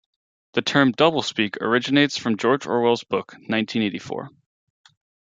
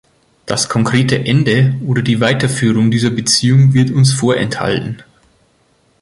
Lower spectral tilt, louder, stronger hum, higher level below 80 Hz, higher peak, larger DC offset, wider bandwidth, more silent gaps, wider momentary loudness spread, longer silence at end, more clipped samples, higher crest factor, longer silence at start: about the same, -5 dB/octave vs -5 dB/octave; second, -21 LUFS vs -13 LUFS; neither; second, -66 dBFS vs -46 dBFS; about the same, -2 dBFS vs 0 dBFS; neither; second, 7.8 kHz vs 11.5 kHz; neither; about the same, 10 LU vs 8 LU; about the same, 1 s vs 1 s; neither; first, 20 dB vs 14 dB; about the same, 0.55 s vs 0.45 s